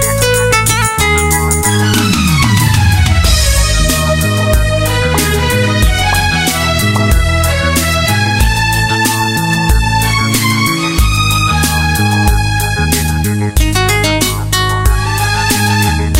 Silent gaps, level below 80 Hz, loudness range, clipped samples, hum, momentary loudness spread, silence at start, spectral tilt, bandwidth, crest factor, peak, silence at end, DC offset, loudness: none; -18 dBFS; 2 LU; under 0.1%; none; 3 LU; 0 s; -4 dB/octave; 16.5 kHz; 10 dB; 0 dBFS; 0 s; under 0.1%; -11 LUFS